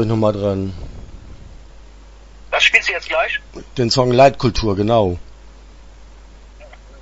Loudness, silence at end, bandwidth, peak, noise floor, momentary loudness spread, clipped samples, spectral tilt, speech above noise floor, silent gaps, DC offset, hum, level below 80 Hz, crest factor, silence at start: -16 LUFS; 0 s; 8 kHz; 0 dBFS; -40 dBFS; 19 LU; under 0.1%; -5 dB/octave; 24 dB; none; under 0.1%; none; -36 dBFS; 18 dB; 0 s